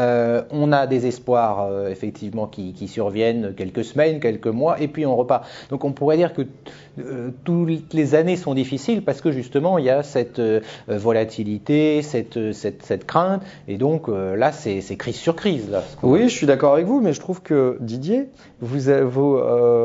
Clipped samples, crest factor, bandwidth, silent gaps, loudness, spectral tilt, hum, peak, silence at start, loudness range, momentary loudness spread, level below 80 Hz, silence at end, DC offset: under 0.1%; 18 dB; 7.8 kHz; none; -21 LUFS; -7 dB/octave; none; -2 dBFS; 0 s; 3 LU; 11 LU; -58 dBFS; 0 s; under 0.1%